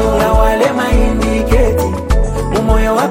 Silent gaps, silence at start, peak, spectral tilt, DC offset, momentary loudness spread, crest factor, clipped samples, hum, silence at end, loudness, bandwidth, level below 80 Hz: none; 0 s; 0 dBFS; -6 dB/octave; under 0.1%; 4 LU; 12 dB; under 0.1%; none; 0 s; -13 LUFS; 17 kHz; -16 dBFS